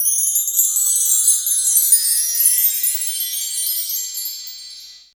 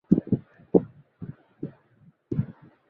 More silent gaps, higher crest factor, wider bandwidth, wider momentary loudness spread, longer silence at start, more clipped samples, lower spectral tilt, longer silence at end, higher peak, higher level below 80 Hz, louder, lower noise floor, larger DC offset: neither; second, 18 dB vs 26 dB; first, over 20 kHz vs 3 kHz; second, 13 LU vs 19 LU; about the same, 0 s vs 0.1 s; neither; second, 7.5 dB/octave vs -13 dB/octave; second, 0.2 s vs 0.4 s; first, 0 dBFS vs -4 dBFS; second, -72 dBFS vs -54 dBFS; first, -14 LUFS vs -27 LUFS; second, -38 dBFS vs -59 dBFS; neither